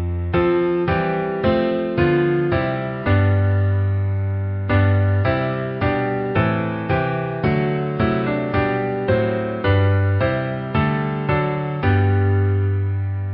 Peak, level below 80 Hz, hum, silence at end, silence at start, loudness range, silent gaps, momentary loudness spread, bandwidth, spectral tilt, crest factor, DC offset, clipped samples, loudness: -6 dBFS; -32 dBFS; none; 0 s; 0 s; 2 LU; none; 5 LU; 5.2 kHz; -12.5 dB/octave; 14 dB; under 0.1%; under 0.1%; -20 LUFS